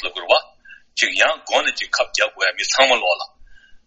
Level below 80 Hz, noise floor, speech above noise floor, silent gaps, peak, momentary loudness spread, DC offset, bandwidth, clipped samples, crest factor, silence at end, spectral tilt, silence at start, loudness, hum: -56 dBFS; -46 dBFS; 28 dB; none; 0 dBFS; 7 LU; under 0.1%; 8.4 kHz; under 0.1%; 20 dB; 0.1 s; 1.5 dB/octave; 0 s; -18 LUFS; none